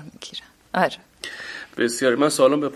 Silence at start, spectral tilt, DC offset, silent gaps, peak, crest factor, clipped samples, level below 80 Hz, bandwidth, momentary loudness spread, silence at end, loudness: 0 s; -4 dB/octave; under 0.1%; none; -4 dBFS; 20 dB; under 0.1%; -64 dBFS; 14 kHz; 18 LU; 0 s; -21 LUFS